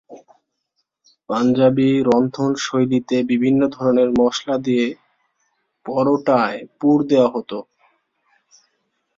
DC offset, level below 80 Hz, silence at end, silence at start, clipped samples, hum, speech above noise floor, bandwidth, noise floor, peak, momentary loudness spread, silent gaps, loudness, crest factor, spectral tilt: under 0.1%; -58 dBFS; 1.55 s; 0.1 s; under 0.1%; none; 56 dB; 7.6 kHz; -73 dBFS; -2 dBFS; 10 LU; none; -18 LUFS; 16 dB; -6.5 dB/octave